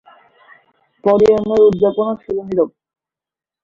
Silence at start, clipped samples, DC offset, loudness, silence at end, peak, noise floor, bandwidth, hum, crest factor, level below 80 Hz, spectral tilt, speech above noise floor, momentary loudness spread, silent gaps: 1.05 s; under 0.1%; under 0.1%; -15 LUFS; 0.95 s; -2 dBFS; -89 dBFS; 7.2 kHz; none; 16 dB; -50 dBFS; -8 dB/octave; 75 dB; 9 LU; none